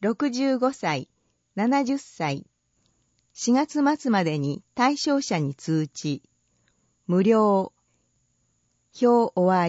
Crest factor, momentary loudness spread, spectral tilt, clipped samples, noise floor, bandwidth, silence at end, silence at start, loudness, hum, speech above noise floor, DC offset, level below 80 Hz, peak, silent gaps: 16 dB; 11 LU; -5.5 dB/octave; under 0.1%; -70 dBFS; 8 kHz; 0 s; 0 s; -24 LUFS; none; 48 dB; under 0.1%; -72 dBFS; -8 dBFS; none